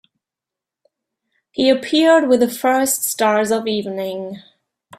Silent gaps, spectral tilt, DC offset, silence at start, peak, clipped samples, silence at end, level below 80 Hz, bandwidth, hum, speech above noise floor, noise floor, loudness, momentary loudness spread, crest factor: none; -3 dB/octave; under 0.1%; 1.6 s; -2 dBFS; under 0.1%; 0.6 s; -64 dBFS; 16 kHz; none; 70 dB; -86 dBFS; -16 LUFS; 16 LU; 16 dB